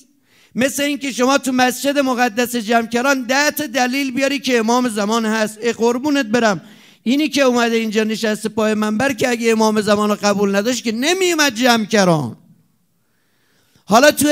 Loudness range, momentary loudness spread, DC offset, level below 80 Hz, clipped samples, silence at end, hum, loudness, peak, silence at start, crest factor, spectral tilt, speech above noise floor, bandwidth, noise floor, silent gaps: 2 LU; 5 LU; under 0.1%; -64 dBFS; under 0.1%; 0 s; none; -16 LUFS; 0 dBFS; 0.55 s; 16 dB; -3.5 dB/octave; 48 dB; 16 kHz; -64 dBFS; none